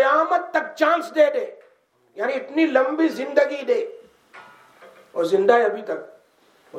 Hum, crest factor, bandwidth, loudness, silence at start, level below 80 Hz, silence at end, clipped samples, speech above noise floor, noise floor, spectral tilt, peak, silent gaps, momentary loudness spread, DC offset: none; 20 dB; 14.5 kHz; -21 LUFS; 0 s; -80 dBFS; 0 s; under 0.1%; 40 dB; -60 dBFS; -4.5 dB/octave; -2 dBFS; none; 13 LU; under 0.1%